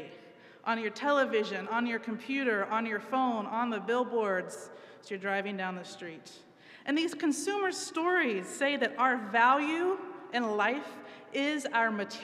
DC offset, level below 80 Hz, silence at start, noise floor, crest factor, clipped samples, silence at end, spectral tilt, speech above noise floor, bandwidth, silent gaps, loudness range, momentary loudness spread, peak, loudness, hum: under 0.1%; under -90 dBFS; 0 s; -54 dBFS; 18 dB; under 0.1%; 0 s; -3.5 dB/octave; 23 dB; 14.5 kHz; none; 6 LU; 14 LU; -12 dBFS; -31 LUFS; none